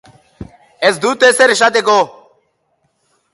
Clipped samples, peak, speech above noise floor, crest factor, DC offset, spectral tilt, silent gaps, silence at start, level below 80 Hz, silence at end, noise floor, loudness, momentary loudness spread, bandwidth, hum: under 0.1%; 0 dBFS; 52 dB; 16 dB; under 0.1%; -2 dB/octave; none; 0.4 s; -52 dBFS; 1.25 s; -63 dBFS; -12 LUFS; 6 LU; 12 kHz; none